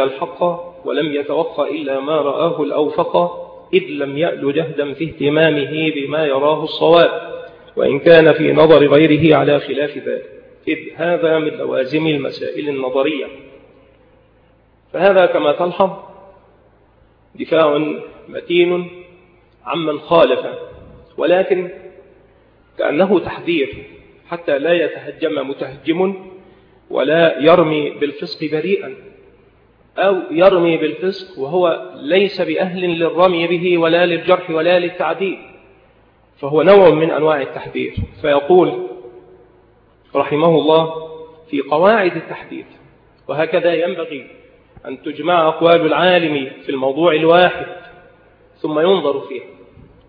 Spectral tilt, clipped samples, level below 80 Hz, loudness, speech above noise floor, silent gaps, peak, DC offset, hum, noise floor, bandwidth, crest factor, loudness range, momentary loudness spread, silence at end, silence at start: -8.5 dB/octave; under 0.1%; -50 dBFS; -15 LUFS; 37 dB; none; 0 dBFS; under 0.1%; none; -52 dBFS; 5.2 kHz; 16 dB; 7 LU; 17 LU; 0.6 s; 0 s